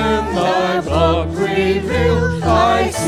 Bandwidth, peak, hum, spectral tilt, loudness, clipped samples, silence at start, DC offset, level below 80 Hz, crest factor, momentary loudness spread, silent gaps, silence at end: 15.5 kHz; -2 dBFS; none; -5.5 dB/octave; -16 LUFS; under 0.1%; 0 s; under 0.1%; -26 dBFS; 14 dB; 3 LU; none; 0 s